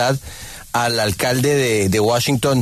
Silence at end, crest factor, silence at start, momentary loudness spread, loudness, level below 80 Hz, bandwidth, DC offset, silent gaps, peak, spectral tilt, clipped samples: 0 s; 12 dB; 0 s; 9 LU; -17 LUFS; -44 dBFS; 14 kHz; under 0.1%; none; -6 dBFS; -4.5 dB/octave; under 0.1%